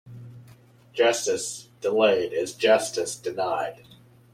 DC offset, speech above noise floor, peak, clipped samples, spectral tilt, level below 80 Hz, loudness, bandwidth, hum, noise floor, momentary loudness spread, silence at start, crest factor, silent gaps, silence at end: under 0.1%; 29 dB; -6 dBFS; under 0.1%; -2.5 dB/octave; -70 dBFS; -24 LUFS; 15.5 kHz; none; -52 dBFS; 13 LU; 0.05 s; 20 dB; none; 0.6 s